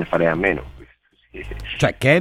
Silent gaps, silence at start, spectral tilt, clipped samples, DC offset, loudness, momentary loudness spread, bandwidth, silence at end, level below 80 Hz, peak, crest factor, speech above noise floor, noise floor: none; 0 s; -6 dB/octave; under 0.1%; under 0.1%; -20 LUFS; 22 LU; 15 kHz; 0 s; -40 dBFS; -2 dBFS; 20 dB; 37 dB; -55 dBFS